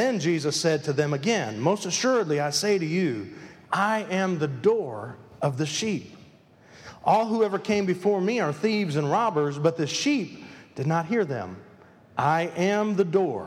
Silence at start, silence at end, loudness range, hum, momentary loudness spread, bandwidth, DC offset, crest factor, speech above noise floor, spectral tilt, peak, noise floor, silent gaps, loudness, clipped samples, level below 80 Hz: 0 s; 0 s; 3 LU; none; 10 LU; 15.5 kHz; under 0.1%; 18 dB; 29 dB; -5 dB/octave; -8 dBFS; -54 dBFS; none; -25 LUFS; under 0.1%; -70 dBFS